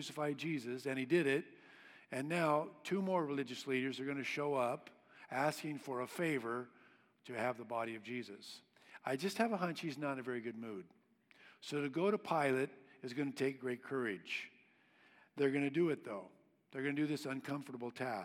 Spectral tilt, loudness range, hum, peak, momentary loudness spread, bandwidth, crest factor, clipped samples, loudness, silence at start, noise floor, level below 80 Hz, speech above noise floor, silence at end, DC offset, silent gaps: -5.5 dB/octave; 4 LU; none; -20 dBFS; 15 LU; 16.5 kHz; 20 dB; under 0.1%; -39 LUFS; 0 s; -69 dBFS; under -90 dBFS; 30 dB; 0 s; under 0.1%; none